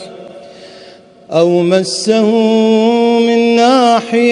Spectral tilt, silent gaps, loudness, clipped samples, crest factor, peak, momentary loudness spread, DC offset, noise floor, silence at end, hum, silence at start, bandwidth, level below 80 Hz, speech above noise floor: -5 dB/octave; none; -11 LUFS; under 0.1%; 12 dB; 0 dBFS; 4 LU; under 0.1%; -38 dBFS; 0 s; none; 0 s; 11 kHz; -64 dBFS; 28 dB